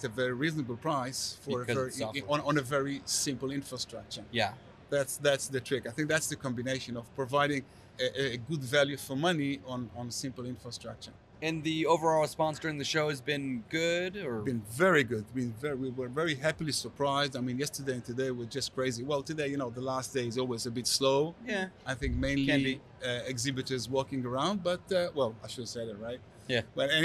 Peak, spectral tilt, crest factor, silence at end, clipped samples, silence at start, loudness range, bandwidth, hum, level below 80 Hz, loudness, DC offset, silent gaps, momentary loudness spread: -14 dBFS; -4 dB/octave; 18 dB; 0 s; under 0.1%; 0 s; 3 LU; 13.5 kHz; none; -56 dBFS; -32 LUFS; under 0.1%; none; 10 LU